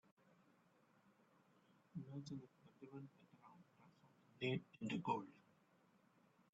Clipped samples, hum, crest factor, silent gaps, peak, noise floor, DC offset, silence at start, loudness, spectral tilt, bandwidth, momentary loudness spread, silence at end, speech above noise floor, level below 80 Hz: under 0.1%; none; 24 dB; none; -28 dBFS; -76 dBFS; under 0.1%; 1.95 s; -49 LUFS; -5 dB/octave; 7.4 kHz; 23 LU; 1.1 s; 27 dB; -86 dBFS